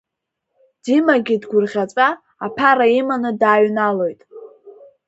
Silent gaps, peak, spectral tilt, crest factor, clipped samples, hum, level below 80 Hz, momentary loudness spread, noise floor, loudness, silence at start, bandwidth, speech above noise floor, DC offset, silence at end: none; 0 dBFS; -6 dB/octave; 18 dB; under 0.1%; none; -66 dBFS; 10 LU; -79 dBFS; -17 LUFS; 0.85 s; 8 kHz; 63 dB; under 0.1%; 0.35 s